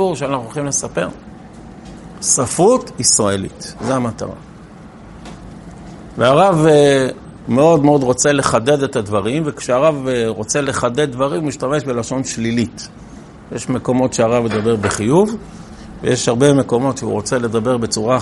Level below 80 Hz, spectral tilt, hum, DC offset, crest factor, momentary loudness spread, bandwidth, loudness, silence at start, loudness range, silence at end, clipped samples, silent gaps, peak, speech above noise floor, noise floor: -44 dBFS; -4.5 dB/octave; none; under 0.1%; 16 dB; 23 LU; 11.5 kHz; -16 LUFS; 0 s; 6 LU; 0 s; under 0.1%; none; 0 dBFS; 22 dB; -37 dBFS